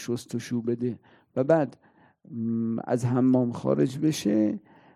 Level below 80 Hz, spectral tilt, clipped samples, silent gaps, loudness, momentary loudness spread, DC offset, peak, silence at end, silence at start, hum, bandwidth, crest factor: -70 dBFS; -7 dB/octave; under 0.1%; none; -26 LUFS; 11 LU; under 0.1%; -8 dBFS; 0.35 s; 0 s; none; 14.5 kHz; 20 dB